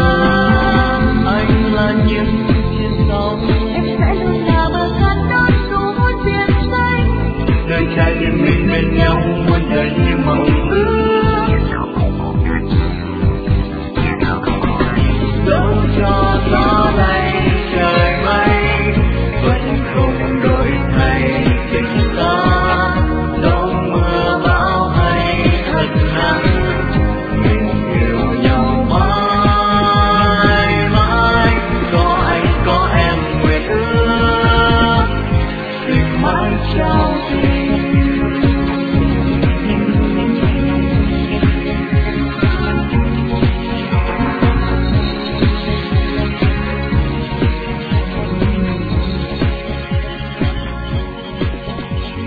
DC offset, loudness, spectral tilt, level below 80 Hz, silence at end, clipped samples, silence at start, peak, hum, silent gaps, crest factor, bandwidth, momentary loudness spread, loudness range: under 0.1%; -15 LUFS; -9 dB/octave; -20 dBFS; 0 s; under 0.1%; 0 s; 0 dBFS; none; none; 14 dB; 4.9 kHz; 6 LU; 4 LU